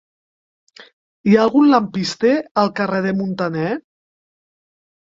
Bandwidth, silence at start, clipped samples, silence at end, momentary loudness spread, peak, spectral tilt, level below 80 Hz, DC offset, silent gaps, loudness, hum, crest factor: 7.8 kHz; 1.25 s; under 0.1%; 1.25 s; 10 LU; -2 dBFS; -6.5 dB/octave; -60 dBFS; under 0.1%; 2.51-2.55 s; -17 LUFS; none; 18 dB